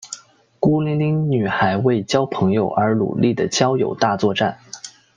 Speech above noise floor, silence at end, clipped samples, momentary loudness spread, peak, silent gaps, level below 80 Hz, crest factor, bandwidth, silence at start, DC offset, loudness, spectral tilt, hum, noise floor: 23 dB; 0.25 s; under 0.1%; 10 LU; -2 dBFS; none; -56 dBFS; 16 dB; 9.8 kHz; 0 s; under 0.1%; -19 LUFS; -6 dB/octave; none; -41 dBFS